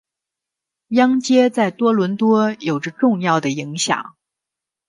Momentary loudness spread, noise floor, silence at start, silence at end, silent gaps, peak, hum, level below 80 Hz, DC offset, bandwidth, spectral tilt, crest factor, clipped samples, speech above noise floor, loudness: 8 LU; -85 dBFS; 0.9 s; 0.8 s; none; -2 dBFS; none; -68 dBFS; under 0.1%; 11.5 kHz; -5 dB/octave; 16 dB; under 0.1%; 68 dB; -18 LUFS